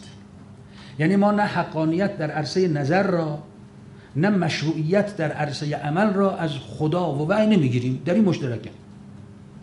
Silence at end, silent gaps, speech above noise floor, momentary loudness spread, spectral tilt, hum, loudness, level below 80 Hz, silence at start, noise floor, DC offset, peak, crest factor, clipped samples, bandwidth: 0 s; none; 22 dB; 11 LU; -7 dB/octave; none; -22 LUFS; -56 dBFS; 0 s; -44 dBFS; under 0.1%; -8 dBFS; 16 dB; under 0.1%; 11 kHz